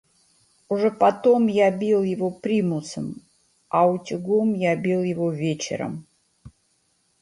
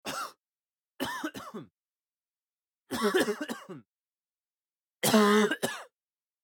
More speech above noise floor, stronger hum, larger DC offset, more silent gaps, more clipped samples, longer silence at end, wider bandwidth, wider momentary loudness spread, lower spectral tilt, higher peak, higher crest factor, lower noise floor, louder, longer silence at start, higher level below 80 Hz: second, 46 dB vs over 64 dB; neither; neither; second, none vs 0.79-0.83 s, 1.72-1.83 s, 2.29-2.33 s, 2.53-2.57 s, 3.88-3.99 s, 4.57-4.61 s; neither; about the same, 0.7 s vs 0.6 s; second, 11.5 kHz vs 19 kHz; second, 13 LU vs 21 LU; first, -6.5 dB/octave vs -3.5 dB/octave; first, -4 dBFS vs -10 dBFS; about the same, 18 dB vs 22 dB; second, -67 dBFS vs under -90 dBFS; first, -22 LUFS vs -29 LUFS; first, 0.7 s vs 0.05 s; first, -64 dBFS vs -74 dBFS